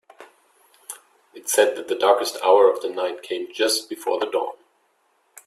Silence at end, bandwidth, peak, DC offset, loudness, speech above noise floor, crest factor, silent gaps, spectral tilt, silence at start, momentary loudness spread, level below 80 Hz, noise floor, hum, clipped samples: 0.9 s; 15 kHz; -2 dBFS; under 0.1%; -21 LUFS; 45 dB; 20 dB; none; -0.5 dB/octave; 0.2 s; 19 LU; -76 dBFS; -66 dBFS; none; under 0.1%